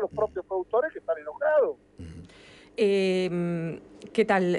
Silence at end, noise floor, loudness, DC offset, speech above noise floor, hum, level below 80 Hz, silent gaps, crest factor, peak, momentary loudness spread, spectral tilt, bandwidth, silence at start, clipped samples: 0 s; -52 dBFS; -27 LUFS; under 0.1%; 26 dB; none; -60 dBFS; none; 16 dB; -12 dBFS; 19 LU; -6.5 dB/octave; 11 kHz; 0 s; under 0.1%